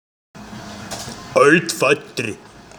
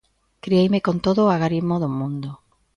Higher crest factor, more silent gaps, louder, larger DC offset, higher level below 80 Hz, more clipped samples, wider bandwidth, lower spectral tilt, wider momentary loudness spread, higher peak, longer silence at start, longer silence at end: first, 20 dB vs 14 dB; neither; first, -17 LUFS vs -21 LUFS; neither; about the same, -54 dBFS vs -52 dBFS; neither; first, over 20 kHz vs 7.2 kHz; second, -4 dB/octave vs -8 dB/octave; first, 22 LU vs 13 LU; first, 0 dBFS vs -6 dBFS; about the same, 0.35 s vs 0.45 s; about the same, 0.4 s vs 0.4 s